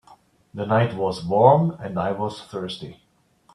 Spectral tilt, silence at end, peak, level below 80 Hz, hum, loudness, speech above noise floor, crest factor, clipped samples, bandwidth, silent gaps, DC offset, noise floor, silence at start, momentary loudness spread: -7.5 dB/octave; 0.6 s; 0 dBFS; -60 dBFS; none; -22 LUFS; 38 dB; 22 dB; under 0.1%; 11.5 kHz; none; under 0.1%; -59 dBFS; 0.55 s; 18 LU